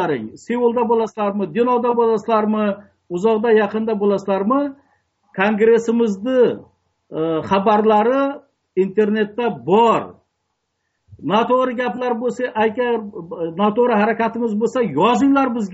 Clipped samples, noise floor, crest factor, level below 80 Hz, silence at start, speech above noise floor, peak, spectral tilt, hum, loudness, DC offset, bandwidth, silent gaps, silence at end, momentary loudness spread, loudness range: under 0.1%; -73 dBFS; 14 dB; -62 dBFS; 0 s; 56 dB; -4 dBFS; -5 dB/octave; none; -18 LUFS; under 0.1%; 8 kHz; none; 0 s; 10 LU; 3 LU